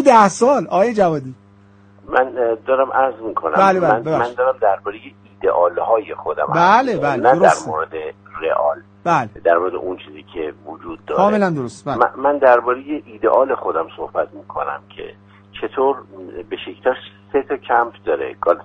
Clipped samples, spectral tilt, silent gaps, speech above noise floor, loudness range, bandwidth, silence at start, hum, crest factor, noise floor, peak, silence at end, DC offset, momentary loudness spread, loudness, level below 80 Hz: under 0.1%; -5.5 dB/octave; none; 30 dB; 6 LU; 9.4 kHz; 0 s; none; 18 dB; -48 dBFS; 0 dBFS; 0 s; under 0.1%; 16 LU; -17 LUFS; -54 dBFS